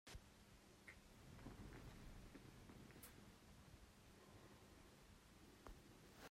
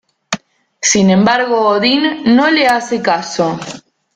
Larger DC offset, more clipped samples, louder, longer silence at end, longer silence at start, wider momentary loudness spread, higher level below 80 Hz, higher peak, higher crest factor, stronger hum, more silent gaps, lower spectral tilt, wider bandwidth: neither; neither; second, -64 LUFS vs -12 LUFS; second, 0 s vs 0.35 s; second, 0.05 s vs 0.3 s; second, 7 LU vs 14 LU; second, -68 dBFS vs -52 dBFS; second, -42 dBFS vs 0 dBFS; first, 20 dB vs 14 dB; neither; neither; about the same, -4.5 dB/octave vs -3.5 dB/octave; first, 16 kHz vs 12 kHz